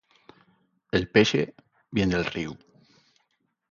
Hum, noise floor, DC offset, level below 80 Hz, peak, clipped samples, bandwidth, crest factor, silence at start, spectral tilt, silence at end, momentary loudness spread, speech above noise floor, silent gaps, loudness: none; -74 dBFS; under 0.1%; -52 dBFS; -4 dBFS; under 0.1%; 7.4 kHz; 24 dB; 0.95 s; -5.5 dB/octave; 1.2 s; 14 LU; 49 dB; none; -25 LUFS